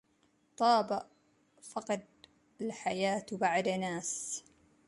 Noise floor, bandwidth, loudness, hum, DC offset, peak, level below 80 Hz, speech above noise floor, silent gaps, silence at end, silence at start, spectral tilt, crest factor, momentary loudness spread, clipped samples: -72 dBFS; 11.5 kHz; -34 LUFS; none; under 0.1%; -14 dBFS; -76 dBFS; 39 dB; none; 0.45 s; 0.6 s; -3.5 dB/octave; 20 dB; 14 LU; under 0.1%